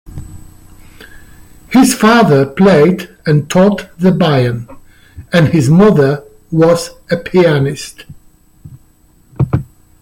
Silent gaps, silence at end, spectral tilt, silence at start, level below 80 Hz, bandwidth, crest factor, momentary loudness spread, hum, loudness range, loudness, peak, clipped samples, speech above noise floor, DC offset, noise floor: none; 0.4 s; -6.5 dB/octave; 0.05 s; -40 dBFS; 16.5 kHz; 12 dB; 12 LU; none; 5 LU; -11 LUFS; 0 dBFS; under 0.1%; 37 dB; under 0.1%; -47 dBFS